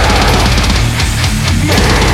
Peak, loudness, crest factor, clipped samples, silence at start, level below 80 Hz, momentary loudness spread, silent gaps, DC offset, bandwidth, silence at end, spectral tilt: 0 dBFS; -11 LUFS; 10 dB; under 0.1%; 0 s; -14 dBFS; 3 LU; none; under 0.1%; 16.5 kHz; 0 s; -4 dB/octave